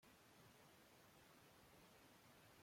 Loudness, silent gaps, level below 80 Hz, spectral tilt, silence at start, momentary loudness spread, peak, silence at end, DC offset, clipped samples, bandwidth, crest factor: -68 LUFS; none; -86 dBFS; -3.5 dB/octave; 0 s; 1 LU; -56 dBFS; 0 s; under 0.1%; under 0.1%; 16.5 kHz; 14 dB